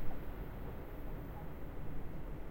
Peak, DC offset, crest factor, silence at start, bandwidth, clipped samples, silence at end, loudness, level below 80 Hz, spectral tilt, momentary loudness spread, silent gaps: -22 dBFS; under 0.1%; 16 dB; 0 s; 16.5 kHz; under 0.1%; 0 s; -48 LUFS; -46 dBFS; -8 dB/octave; 1 LU; none